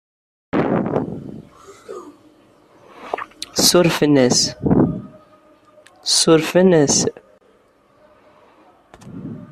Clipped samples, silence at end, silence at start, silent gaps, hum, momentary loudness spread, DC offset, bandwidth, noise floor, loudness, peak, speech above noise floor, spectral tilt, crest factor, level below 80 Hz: under 0.1%; 0.05 s; 0.55 s; none; none; 23 LU; under 0.1%; 14 kHz; -55 dBFS; -16 LUFS; 0 dBFS; 41 dB; -4 dB/octave; 20 dB; -50 dBFS